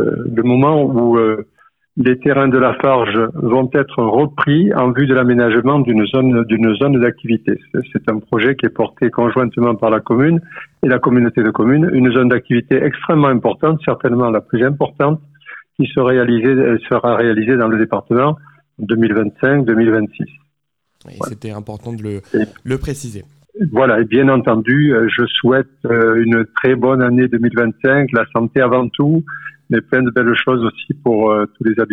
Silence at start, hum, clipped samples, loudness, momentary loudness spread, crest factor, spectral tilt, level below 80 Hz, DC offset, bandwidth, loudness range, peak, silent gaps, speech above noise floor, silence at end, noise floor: 0 s; none; under 0.1%; -14 LUFS; 9 LU; 12 dB; -8 dB/octave; -48 dBFS; under 0.1%; 10.5 kHz; 4 LU; -2 dBFS; none; 57 dB; 0 s; -71 dBFS